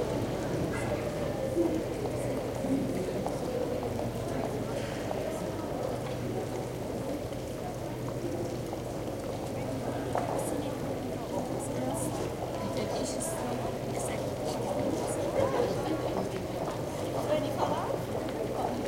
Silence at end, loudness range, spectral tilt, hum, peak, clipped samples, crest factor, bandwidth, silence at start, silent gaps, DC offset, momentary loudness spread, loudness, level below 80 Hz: 0 s; 4 LU; -6 dB/octave; none; -14 dBFS; under 0.1%; 18 dB; 16.5 kHz; 0 s; none; under 0.1%; 5 LU; -33 LUFS; -50 dBFS